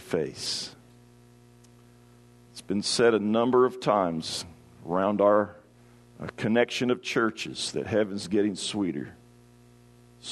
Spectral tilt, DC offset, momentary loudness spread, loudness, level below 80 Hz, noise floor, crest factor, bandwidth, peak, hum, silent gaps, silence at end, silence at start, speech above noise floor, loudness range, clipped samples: -4.5 dB/octave; under 0.1%; 18 LU; -26 LUFS; -66 dBFS; -55 dBFS; 20 dB; 12.5 kHz; -8 dBFS; 60 Hz at -55 dBFS; none; 0 s; 0 s; 29 dB; 5 LU; under 0.1%